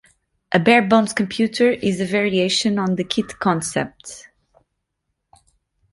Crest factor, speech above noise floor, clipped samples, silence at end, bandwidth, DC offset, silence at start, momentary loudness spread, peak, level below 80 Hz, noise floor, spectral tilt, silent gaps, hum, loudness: 20 dB; 58 dB; under 0.1%; 1.7 s; 11.5 kHz; under 0.1%; 0.5 s; 12 LU; -2 dBFS; -56 dBFS; -76 dBFS; -4.5 dB/octave; none; none; -19 LUFS